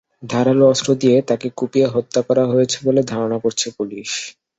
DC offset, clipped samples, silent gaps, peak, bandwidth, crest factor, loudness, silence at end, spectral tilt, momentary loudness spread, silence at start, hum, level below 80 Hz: under 0.1%; under 0.1%; none; -2 dBFS; 8.2 kHz; 16 dB; -18 LUFS; 0.25 s; -5 dB/octave; 10 LU; 0.2 s; none; -60 dBFS